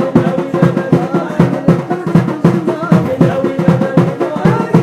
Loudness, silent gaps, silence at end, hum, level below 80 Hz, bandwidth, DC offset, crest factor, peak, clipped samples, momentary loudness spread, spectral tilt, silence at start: -13 LUFS; none; 0 s; none; -44 dBFS; 10.5 kHz; under 0.1%; 12 dB; 0 dBFS; 0.1%; 3 LU; -8.5 dB/octave; 0 s